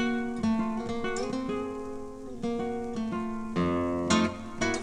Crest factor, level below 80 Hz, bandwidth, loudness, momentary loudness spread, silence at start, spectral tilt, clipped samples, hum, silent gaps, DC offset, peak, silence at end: 18 dB; -50 dBFS; 10.5 kHz; -31 LUFS; 10 LU; 0 s; -5 dB/octave; under 0.1%; none; none; under 0.1%; -12 dBFS; 0 s